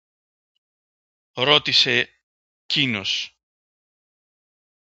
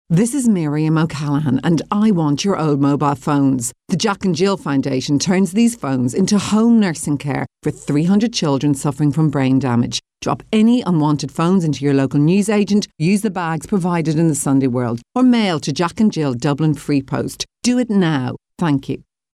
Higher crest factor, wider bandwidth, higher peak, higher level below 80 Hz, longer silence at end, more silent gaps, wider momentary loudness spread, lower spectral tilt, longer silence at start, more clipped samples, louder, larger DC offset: first, 26 dB vs 12 dB; second, 8 kHz vs 14 kHz; first, 0 dBFS vs -6 dBFS; second, -66 dBFS vs -50 dBFS; first, 1.65 s vs 0.35 s; first, 2.23-2.69 s vs none; first, 15 LU vs 7 LU; second, -3 dB/octave vs -6 dB/octave; first, 1.35 s vs 0.1 s; neither; about the same, -19 LUFS vs -17 LUFS; neither